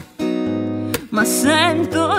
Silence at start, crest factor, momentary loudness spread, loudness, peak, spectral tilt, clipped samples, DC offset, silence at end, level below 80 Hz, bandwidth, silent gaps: 0 s; 16 dB; 9 LU; -18 LUFS; -2 dBFS; -3.5 dB/octave; under 0.1%; under 0.1%; 0 s; -52 dBFS; 16 kHz; none